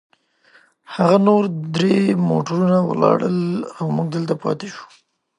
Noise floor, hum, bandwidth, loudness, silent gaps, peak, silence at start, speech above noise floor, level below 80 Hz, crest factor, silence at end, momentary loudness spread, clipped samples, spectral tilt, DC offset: -55 dBFS; none; 10 kHz; -18 LUFS; none; -2 dBFS; 0.9 s; 37 dB; -64 dBFS; 18 dB; 0.55 s; 10 LU; under 0.1%; -7.5 dB/octave; under 0.1%